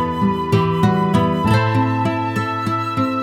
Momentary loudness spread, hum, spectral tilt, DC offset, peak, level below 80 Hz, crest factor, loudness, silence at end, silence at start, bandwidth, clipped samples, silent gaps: 5 LU; none; -7.5 dB/octave; under 0.1%; -2 dBFS; -44 dBFS; 14 dB; -18 LUFS; 0 s; 0 s; 14.5 kHz; under 0.1%; none